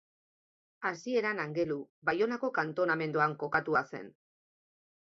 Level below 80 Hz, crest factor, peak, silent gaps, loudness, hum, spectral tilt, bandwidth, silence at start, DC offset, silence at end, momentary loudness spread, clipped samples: -74 dBFS; 20 dB; -12 dBFS; 1.89-2.02 s; -32 LUFS; none; -6 dB/octave; 7.6 kHz; 0.8 s; under 0.1%; 0.95 s; 8 LU; under 0.1%